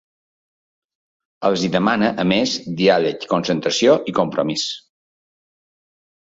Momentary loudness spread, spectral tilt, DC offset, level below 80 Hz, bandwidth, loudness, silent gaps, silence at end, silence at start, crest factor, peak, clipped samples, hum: 7 LU; -4.5 dB/octave; under 0.1%; -58 dBFS; 8 kHz; -18 LUFS; none; 1.5 s; 1.4 s; 18 dB; -2 dBFS; under 0.1%; none